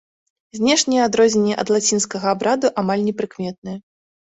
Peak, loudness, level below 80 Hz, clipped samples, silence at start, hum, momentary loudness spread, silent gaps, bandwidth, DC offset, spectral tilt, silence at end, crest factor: -4 dBFS; -18 LUFS; -60 dBFS; under 0.1%; 0.55 s; none; 15 LU; 3.58-3.62 s; 8.4 kHz; under 0.1%; -3.5 dB/octave; 0.55 s; 16 dB